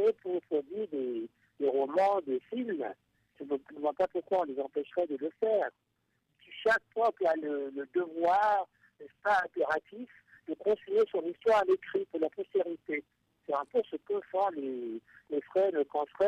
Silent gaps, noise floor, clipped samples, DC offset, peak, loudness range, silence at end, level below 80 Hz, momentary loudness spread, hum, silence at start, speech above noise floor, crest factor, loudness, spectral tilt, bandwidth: none; -78 dBFS; under 0.1%; under 0.1%; -18 dBFS; 3 LU; 0 s; -76 dBFS; 11 LU; none; 0 s; 46 dB; 14 dB; -32 LUFS; -5.5 dB/octave; 9.6 kHz